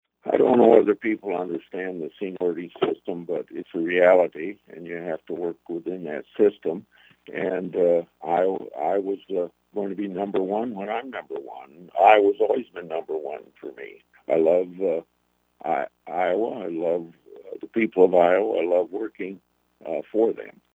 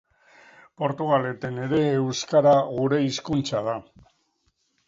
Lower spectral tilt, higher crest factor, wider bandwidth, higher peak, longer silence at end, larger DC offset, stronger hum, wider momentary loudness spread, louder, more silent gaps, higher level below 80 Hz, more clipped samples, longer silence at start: first, -8 dB/octave vs -6 dB/octave; first, 24 dB vs 16 dB; about the same, 7.6 kHz vs 7.8 kHz; first, 0 dBFS vs -8 dBFS; second, 0.25 s vs 1.05 s; neither; neither; first, 18 LU vs 11 LU; about the same, -24 LUFS vs -24 LUFS; neither; second, -74 dBFS vs -60 dBFS; neither; second, 0.25 s vs 0.8 s